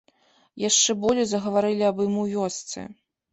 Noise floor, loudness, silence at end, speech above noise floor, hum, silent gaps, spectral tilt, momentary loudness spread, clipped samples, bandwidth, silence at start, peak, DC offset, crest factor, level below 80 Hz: -62 dBFS; -23 LUFS; 0.4 s; 38 dB; none; none; -3 dB/octave; 15 LU; under 0.1%; 8.4 kHz; 0.55 s; -8 dBFS; under 0.1%; 18 dB; -62 dBFS